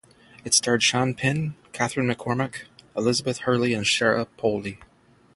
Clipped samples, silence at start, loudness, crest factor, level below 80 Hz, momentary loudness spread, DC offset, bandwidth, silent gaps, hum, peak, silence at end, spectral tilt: under 0.1%; 0.45 s; -23 LUFS; 20 dB; -58 dBFS; 12 LU; under 0.1%; 11.5 kHz; none; none; -6 dBFS; 0.5 s; -3.5 dB/octave